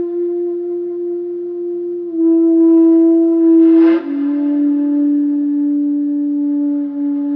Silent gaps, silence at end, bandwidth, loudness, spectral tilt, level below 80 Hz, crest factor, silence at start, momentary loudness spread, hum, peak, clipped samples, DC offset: none; 0 s; 3.1 kHz; -14 LUFS; -9 dB/octave; -84 dBFS; 10 dB; 0 s; 12 LU; none; -4 dBFS; under 0.1%; under 0.1%